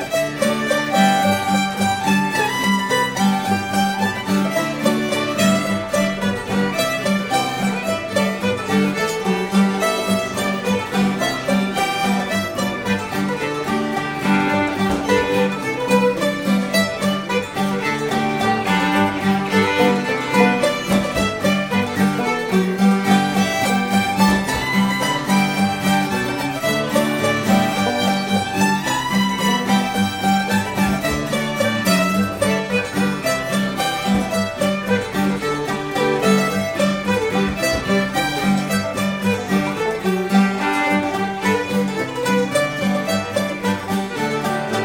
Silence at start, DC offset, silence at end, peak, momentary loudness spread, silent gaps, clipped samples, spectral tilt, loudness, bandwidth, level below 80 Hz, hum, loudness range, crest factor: 0 s; under 0.1%; 0 s; 0 dBFS; 5 LU; none; under 0.1%; -5 dB/octave; -19 LUFS; 17 kHz; -46 dBFS; none; 2 LU; 18 dB